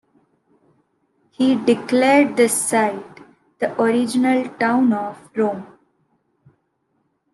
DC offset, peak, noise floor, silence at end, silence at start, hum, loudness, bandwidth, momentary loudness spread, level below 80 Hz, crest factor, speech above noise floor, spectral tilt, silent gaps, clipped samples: under 0.1%; -2 dBFS; -69 dBFS; 1.7 s; 1.4 s; none; -18 LUFS; 12.5 kHz; 10 LU; -70 dBFS; 18 dB; 51 dB; -4 dB/octave; none; under 0.1%